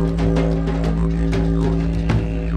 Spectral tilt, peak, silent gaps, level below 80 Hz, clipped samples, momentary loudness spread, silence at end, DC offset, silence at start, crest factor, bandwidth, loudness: -8.5 dB/octave; -4 dBFS; none; -22 dBFS; under 0.1%; 2 LU; 0 s; under 0.1%; 0 s; 14 dB; 9 kHz; -20 LUFS